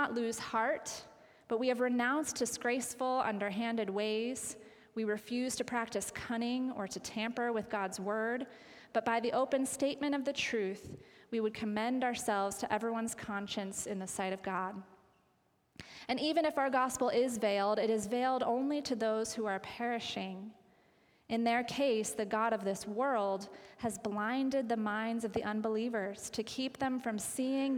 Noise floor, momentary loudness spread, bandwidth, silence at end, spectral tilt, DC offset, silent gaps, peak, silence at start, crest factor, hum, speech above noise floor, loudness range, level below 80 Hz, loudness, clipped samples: -74 dBFS; 8 LU; 18.5 kHz; 0 s; -3.5 dB/octave; under 0.1%; none; -16 dBFS; 0 s; 18 dB; none; 39 dB; 4 LU; -72 dBFS; -35 LUFS; under 0.1%